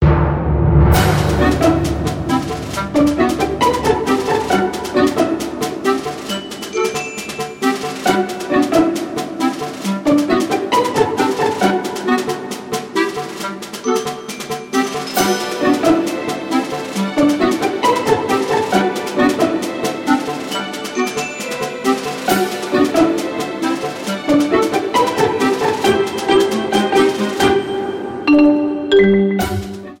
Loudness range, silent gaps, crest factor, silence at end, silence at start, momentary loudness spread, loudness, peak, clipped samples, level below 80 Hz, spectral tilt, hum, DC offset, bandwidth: 4 LU; none; 16 dB; 0.05 s; 0 s; 9 LU; -17 LUFS; 0 dBFS; under 0.1%; -32 dBFS; -5.5 dB/octave; none; under 0.1%; 17 kHz